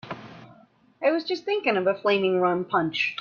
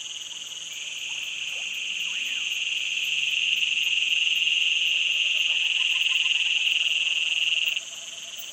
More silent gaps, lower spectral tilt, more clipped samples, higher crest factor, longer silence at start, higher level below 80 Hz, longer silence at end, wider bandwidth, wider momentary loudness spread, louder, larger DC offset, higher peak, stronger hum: neither; first, -6 dB/octave vs 4 dB/octave; neither; about the same, 16 dB vs 16 dB; about the same, 0.05 s vs 0 s; about the same, -72 dBFS vs -76 dBFS; about the same, 0 s vs 0 s; second, 7 kHz vs 16 kHz; second, 5 LU vs 12 LU; about the same, -24 LUFS vs -22 LUFS; neither; about the same, -8 dBFS vs -10 dBFS; neither